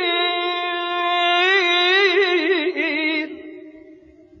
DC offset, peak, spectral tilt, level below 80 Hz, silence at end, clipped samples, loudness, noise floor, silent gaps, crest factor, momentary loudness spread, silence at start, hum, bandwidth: under 0.1%; -6 dBFS; -1.5 dB/octave; -70 dBFS; 0.45 s; under 0.1%; -18 LUFS; -47 dBFS; none; 14 dB; 9 LU; 0 s; none; 7.4 kHz